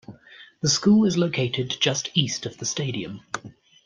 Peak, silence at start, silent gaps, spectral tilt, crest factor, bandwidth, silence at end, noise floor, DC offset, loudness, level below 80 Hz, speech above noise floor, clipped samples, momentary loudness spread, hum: -6 dBFS; 0.1 s; none; -4 dB/octave; 20 dB; 9.8 kHz; 0.35 s; -49 dBFS; under 0.1%; -23 LUFS; -62 dBFS; 26 dB; under 0.1%; 15 LU; none